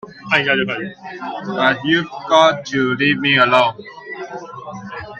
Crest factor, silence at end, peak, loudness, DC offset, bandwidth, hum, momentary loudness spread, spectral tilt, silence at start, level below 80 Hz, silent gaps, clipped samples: 18 dB; 0 s; 0 dBFS; -16 LUFS; under 0.1%; 8.4 kHz; none; 18 LU; -4.5 dB/octave; 0.05 s; -58 dBFS; none; under 0.1%